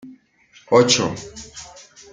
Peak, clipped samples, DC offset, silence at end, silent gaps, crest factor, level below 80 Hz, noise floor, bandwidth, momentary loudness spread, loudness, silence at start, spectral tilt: -2 dBFS; under 0.1%; under 0.1%; 0.5 s; none; 20 dB; -54 dBFS; -53 dBFS; 9.6 kHz; 23 LU; -17 LUFS; 0.05 s; -3.5 dB/octave